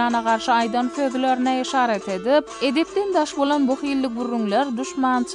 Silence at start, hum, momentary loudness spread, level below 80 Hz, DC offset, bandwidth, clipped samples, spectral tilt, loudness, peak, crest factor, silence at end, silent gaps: 0 s; none; 4 LU; -60 dBFS; under 0.1%; 10.5 kHz; under 0.1%; -4 dB/octave; -21 LUFS; -6 dBFS; 14 dB; 0 s; none